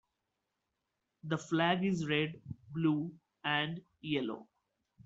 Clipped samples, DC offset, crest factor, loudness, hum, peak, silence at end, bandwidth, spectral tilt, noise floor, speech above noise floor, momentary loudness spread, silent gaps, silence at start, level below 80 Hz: under 0.1%; under 0.1%; 22 dB; -35 LUFS; none; -16 dBFS; 0.6 s; 8 kHz; -4 dB/octave; -86 dBFS; 51 dB; 14 LU; none; 1.25 s; -74 dBFS